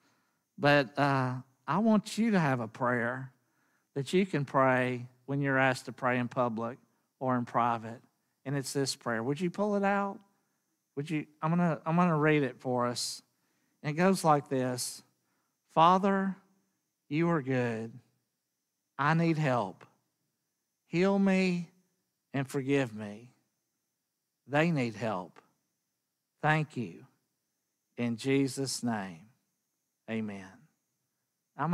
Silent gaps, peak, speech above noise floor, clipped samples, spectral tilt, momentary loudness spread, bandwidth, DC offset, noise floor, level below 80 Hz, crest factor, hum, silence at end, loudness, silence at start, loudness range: none; -10 dBFS; 55 dB; under 0.1%; -6 dB/octave; 15 LU; 14.5 kHz; under 0.1%; -84 dBFS; -76 dBFS; 22 dB; none; 0 s; -30 LUFS; 0.6 s; 6 LU